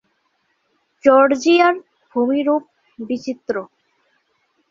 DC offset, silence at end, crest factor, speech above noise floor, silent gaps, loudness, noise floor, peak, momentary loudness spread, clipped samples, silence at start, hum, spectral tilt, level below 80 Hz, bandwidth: under 0.1%; 1.05 s; 18 dB; 51 dB; none; -17 LUFS; -67 dBFS; -2 dBFS; 14 LU; under 0.1%; 1.05 s; none; -4 dB/octave; -66 dBFS; 7.6 kHz